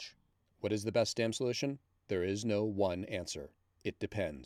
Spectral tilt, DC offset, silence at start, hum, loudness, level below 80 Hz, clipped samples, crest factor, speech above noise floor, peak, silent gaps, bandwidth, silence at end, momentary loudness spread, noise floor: -5 dB/octave; under 0.1%; 0 s; none; -36 LUFS; -64 dBFS; under 0.1%; 18 dB; 37 dB; -18 dBFS; none; 14.5 kHz; 0 s; 11 LU; -72 dBFS